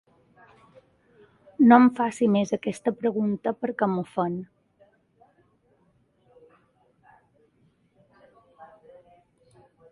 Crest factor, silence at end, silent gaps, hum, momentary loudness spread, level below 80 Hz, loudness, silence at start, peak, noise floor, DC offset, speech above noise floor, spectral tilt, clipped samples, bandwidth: 24 dB; 1.25 s; none; none; 13 LU; -70 dBFS; -23 LUFS; 1.6 s; -2 dBFS; -66 dBFS; under 0.1%; 44 dB; -7 dB/octave; under 0.1%; 11.5 kHz